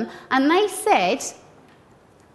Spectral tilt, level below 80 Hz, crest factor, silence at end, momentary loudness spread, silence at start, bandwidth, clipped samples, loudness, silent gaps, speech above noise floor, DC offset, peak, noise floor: -3 dB/octave; -66 dBFS; 18 dB; 1 s; 8 LU; 0 s; 12.5 kHz; under 0.1%; -20 LUFS; none; 32 dB; under 0.1%; -6 dBFS; -52 dBFS